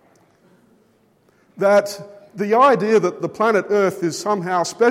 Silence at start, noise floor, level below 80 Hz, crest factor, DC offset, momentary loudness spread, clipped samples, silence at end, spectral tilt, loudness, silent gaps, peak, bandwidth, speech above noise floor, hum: 1.55 s; -58 dBFS; -72 dBFS; 16 dB; under 0.1%; 13 LU; under 0.1%; 0 s; -5 dB/octave; -18 LUFS; none; -4 dBFS; 16 kHz; 41 dB; none